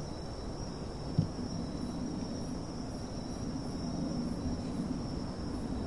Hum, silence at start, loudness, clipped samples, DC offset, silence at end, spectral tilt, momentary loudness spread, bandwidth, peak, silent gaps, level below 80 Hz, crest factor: none; 0 s; -38 LUFS; under 0.1%; 0.2%; 0 s; -6.5 dB/octave; 6 LU; 11.5 kHz; -16 dBFS; none; -46 dBFS; 20 dB